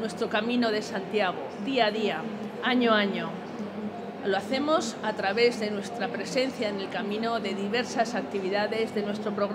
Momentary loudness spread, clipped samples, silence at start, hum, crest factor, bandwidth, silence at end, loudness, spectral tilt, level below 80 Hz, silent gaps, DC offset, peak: 9 LU; under 0.1%; 0 s; none; 18 dB; 15.5 kHz; 0 s; -28 LUFS; -4.5 dB/octave; -76 dBFS; none; under 0.1%; -10 dBFS